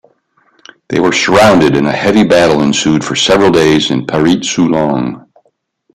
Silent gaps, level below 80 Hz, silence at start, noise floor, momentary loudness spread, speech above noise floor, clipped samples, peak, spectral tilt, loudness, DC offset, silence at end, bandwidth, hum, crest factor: none; -42 dBFS; 0.9 s; -58 dBFS; 7 LU; 48 dB; under 0.1%; 0 dBFS; -4.5 dB/octave; -10 LUFS; under 0.1%; 0.75 s; 15 kHz; none; 10 dB